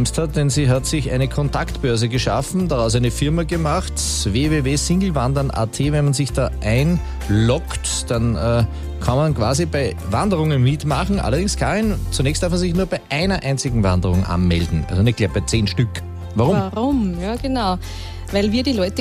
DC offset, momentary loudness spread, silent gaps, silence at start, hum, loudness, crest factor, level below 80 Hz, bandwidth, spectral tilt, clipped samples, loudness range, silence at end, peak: under 0.1%; 4 LU; none; 0 s; none; -19 LUFS; 14 dB; -28 dBFS; 15.5 kHz; -5.5 dB/octave; under 0.1%; 1 LU; 0 s; -4 dBFS